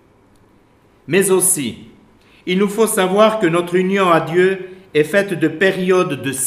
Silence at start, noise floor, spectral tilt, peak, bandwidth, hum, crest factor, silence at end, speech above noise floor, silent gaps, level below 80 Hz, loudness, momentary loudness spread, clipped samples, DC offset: 1.1 s; -52 dBFS; -4 dB/octave; 0 dBFS; 16 kHz; none; 16 dB; 0 s; 37 dB; none; -60 dBFS; -15 LUFS; 7 LU; under 0.1%; under 0.1%